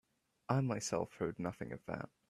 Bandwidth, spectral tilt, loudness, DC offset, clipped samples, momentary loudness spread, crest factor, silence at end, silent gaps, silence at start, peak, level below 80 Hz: 13.5 kHz; -6 dB/octave; -40 LUFS; under 0.1%; under 0.1%; 10 LU; 22 dB; 0.2 s; none; 0.5 s; -18 dBFS; -70 dBFS